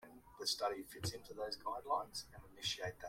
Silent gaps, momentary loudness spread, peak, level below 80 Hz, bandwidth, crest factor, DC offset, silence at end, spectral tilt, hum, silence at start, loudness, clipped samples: none; 9 LU; -24 dBFS; -68 dBFS; 16.5 kHz; 20 dB; under 0.1%; 0 s; -2.5 dB/octave; none; 0 s; -42 LUFS; under 0.1%